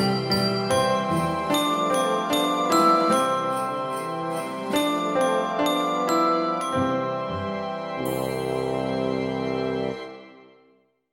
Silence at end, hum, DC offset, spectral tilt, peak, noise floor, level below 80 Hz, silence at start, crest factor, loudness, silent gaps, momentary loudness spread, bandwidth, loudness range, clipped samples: 0.7 s; none; under 0.1%; -5 dB/octave; -8 dBFS; -62 dBFS; -58 dBFS; 0 s; 18 dB; -24 LUFS; none; 8 LU; 16.5 kHz; 6 LU; under 0.1%